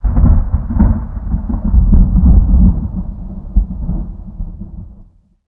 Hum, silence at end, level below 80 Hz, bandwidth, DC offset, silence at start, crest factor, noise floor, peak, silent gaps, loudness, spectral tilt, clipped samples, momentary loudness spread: none; 0.45 s; -14 dBFS; 1.9 kHz; under 0.1%; 0.05 s; 12 dB; -43 dBFS; 0 dBFS; none; -15 LUFS; -14.5 dB/octave; under 0.1%; 18 LU